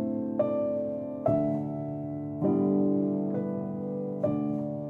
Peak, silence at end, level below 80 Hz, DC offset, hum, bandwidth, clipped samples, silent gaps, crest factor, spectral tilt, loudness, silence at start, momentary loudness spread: -14 dBFS; 0 s; -62 dBFS; under 0.1%; none; 3.4 kHz; under 0.1%; none; 16 dB; -12 dB/octave; -30 LUFS; 0 s; 8 LU